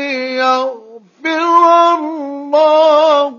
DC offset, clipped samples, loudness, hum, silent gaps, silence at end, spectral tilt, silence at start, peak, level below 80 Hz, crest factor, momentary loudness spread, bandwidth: under 0.1%; under 0.1%; -11 LUFS; none; none; 0 s; -2 dB/octave; 0 s; 0 dBFS; -84 dBFS; 12 dB; 13 LU; 7.2 kHz